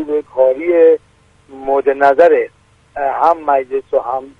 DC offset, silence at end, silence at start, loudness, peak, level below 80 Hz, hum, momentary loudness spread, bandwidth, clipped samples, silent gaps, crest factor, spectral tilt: under 0.1%; 0.1 s; 0 s; -13 LUFS; 0 dBFS; -54 dBFS; none; 10 LU; 5.4 kHz; under 0.1%; none; 14 dB; -6 dB/octave